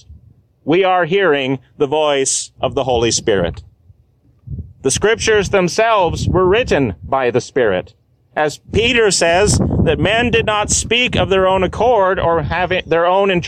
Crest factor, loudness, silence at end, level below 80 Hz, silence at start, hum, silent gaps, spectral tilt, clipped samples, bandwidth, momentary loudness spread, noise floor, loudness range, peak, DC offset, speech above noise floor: 12 dB; -15 LUFS; 0 s; -32 dBFS; 0.1 s; none; none; -4 dB/octave; under 0.1%; 14.5 kHz; 7 LU; -53 dBFS; 4 LU; -2 dBFS; under 0.1%; 39 dB